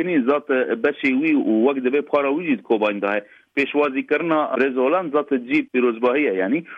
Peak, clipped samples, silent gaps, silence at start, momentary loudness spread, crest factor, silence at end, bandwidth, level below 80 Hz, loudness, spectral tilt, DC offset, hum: -6 dBFS; under 0.1%; none; 0 s; 4 LU; 14 dB; 0 s; 5.6 kHz; -70 dBFS; -20 LUFS; -7.5 dB/octave; under 0.1%; none